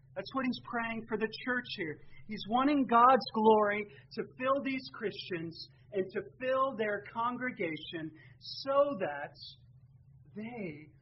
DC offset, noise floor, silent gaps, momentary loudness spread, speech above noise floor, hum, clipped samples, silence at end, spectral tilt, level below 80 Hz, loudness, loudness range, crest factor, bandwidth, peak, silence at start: under 0.1%; -59 dBFS; none; 18 LU; 26 dB; none; under 0.1%; 0.15 s; -3 dB/octave; -66 dBFS; -32 LUFS; 7 LU; 22 dB; 5.8 kHz; -12 dBFS; 0.15 s